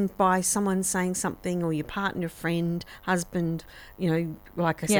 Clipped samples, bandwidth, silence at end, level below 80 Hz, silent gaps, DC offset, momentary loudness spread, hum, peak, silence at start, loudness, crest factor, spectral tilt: under 0.1%; over 20 kHz; 0 s; -52 dBFS; none; under 0.1%; 8 LU; none; -8 dBFS; 0 s; -28 LUFS; 18 dB; -4.5 dB/octave